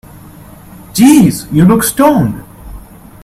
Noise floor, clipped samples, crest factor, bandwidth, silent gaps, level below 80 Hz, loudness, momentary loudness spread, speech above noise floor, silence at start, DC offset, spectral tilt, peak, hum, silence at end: -34 dBFS; 0.2%; 12 dB; 16 kHz; none; -36 dBFS; -9 LUFS; 12 LU; 26 dB; 0.95 s; under 0.1%; -6 dB/octave; 0 dBFS; none; 0.45 s